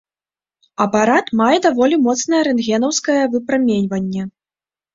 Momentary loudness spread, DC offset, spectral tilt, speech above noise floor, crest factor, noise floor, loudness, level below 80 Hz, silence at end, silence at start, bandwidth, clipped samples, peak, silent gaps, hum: 8 LU; under 0.1%; -4.5 dB/octave; over 74 dB; 16 dB; under -90 dBFS; -16 LUFS; -58 dBFS; 0.65 s; 0.8 s; 7.8 kHz; under 0.1%; -2 dBFS; none; none